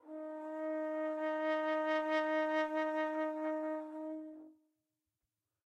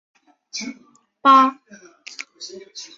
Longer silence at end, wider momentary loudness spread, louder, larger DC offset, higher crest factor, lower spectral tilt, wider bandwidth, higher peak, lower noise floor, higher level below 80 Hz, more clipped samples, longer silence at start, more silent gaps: first, 1.15 s vs 0.1 s; second, 11 LU vs 23 LU; second, -37 LUFS vs -17 LUFS; neither; second, 14 dB vs 20 dB; about the same, -3 dB/octave vs -2 dB/octave; about the same, 8.2 kHz vs 7.8 kHz; second, -24 dBFS vs -2 dBFS; first, under -90 dBFS vs -39 dBFS; second, -88 dBFS vs -74 dBFS; neither; second, 0.05 s vs 0.55 s; neither